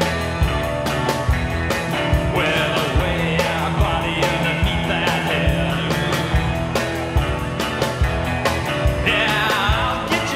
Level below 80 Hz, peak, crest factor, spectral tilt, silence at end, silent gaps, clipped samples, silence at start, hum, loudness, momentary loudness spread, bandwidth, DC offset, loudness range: -26 dBFS; -4 dBFS; 16 dB; -5 dB/octave; 0 s; none; under 0.1%; 0 s; none; -20 LUFS; 4 LU; 16 kHz; under 0.1%; 2 LU